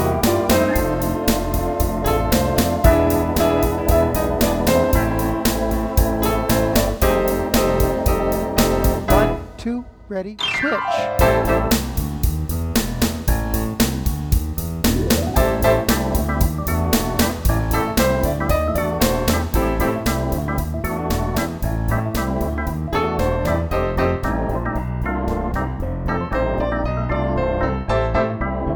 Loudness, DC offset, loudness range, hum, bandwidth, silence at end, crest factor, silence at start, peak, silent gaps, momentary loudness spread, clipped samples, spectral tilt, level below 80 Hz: -20 LUFS; under 0.1%; 4 LU; none; over 20 kHz; 0 s; 18 dB; 0 s; 0 dBFS; none; 7 LU; under 0.1%; -5.5 dB/octave; -26 dBFS